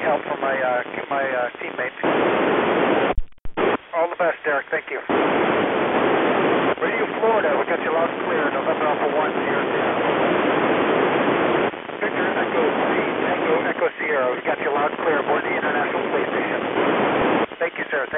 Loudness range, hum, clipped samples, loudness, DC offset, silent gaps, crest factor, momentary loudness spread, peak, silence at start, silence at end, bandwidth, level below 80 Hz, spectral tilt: 1 LU; none; under 0.1%; -21 LUFS; under 0.1%; none; 16 dB; 5 LU; -6 dBFS; 0 s; 0 s; 4 kHz; -44 dBFS; -9.5 dB/octave